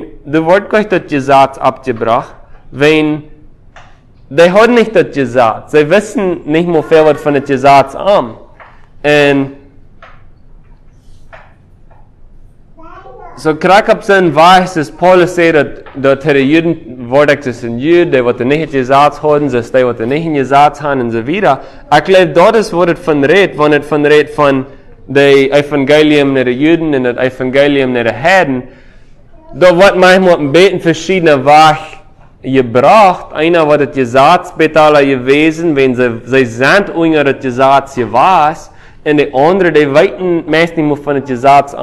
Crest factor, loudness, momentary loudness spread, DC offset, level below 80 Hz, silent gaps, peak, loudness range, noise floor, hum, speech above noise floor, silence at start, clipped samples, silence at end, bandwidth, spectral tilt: 10 dB; -9 LUFS; 8 LU; under 0.1%; -40 dBFS; none; 0 dBFS; 4 LU; -38 dBFS; none; 30 dB; 0 s; 2%; 0 s; 13 kHz; -6 dB/octave